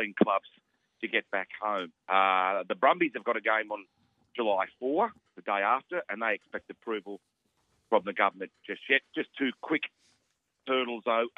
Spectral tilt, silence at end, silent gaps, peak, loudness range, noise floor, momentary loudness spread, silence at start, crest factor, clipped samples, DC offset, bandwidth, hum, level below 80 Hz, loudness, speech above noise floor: -6.5 dB/octave; 0.1 s; none; -8 dBFS; 4 LU; -77 dBFS; 14 LU; 0 s; 24 dB; under 0.1%; under 0.1%; 7 kHz; none; -82 dBFS; -30 LUFS; 47 dB